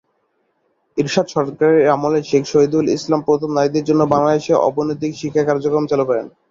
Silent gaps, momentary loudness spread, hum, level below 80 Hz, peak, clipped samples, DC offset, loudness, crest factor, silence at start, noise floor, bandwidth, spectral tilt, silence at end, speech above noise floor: none; 7 LU; none; -56 dBFS; -2 dBFS; under 0.1%; under 0.1%; -17 LUFS; 14 dB; 0.95 s; -66 dBFS; 7.6 kHz; -6 dB/octave; 0.2 s; 50 dB